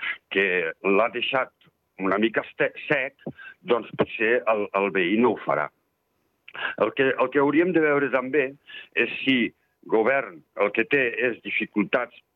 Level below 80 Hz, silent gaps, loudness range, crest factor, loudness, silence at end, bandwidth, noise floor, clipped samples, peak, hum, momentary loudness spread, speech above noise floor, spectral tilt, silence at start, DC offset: -74 dBFS; none; 2 LU; 16 dB; -24 LUFS; 0.3 s; 4.9 kHz; -72 dBFS; under 0.1%; -8 dBFS; none; 9 LU; 48 dB; -8 dB/octave; 0 s; under 0.1%